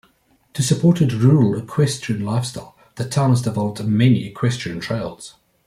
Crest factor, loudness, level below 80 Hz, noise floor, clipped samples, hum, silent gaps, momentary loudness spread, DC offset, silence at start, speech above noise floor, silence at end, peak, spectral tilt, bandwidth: 16 dB; -19 LUFS; -54 dBFS; -59 dBFS; under 0.1%; none; none; 15 LU; under 0.1%; 0.55 s; 41 dB; 0.35 s; -2 dBFS; -6.5 dB/octave; 14.5 kHz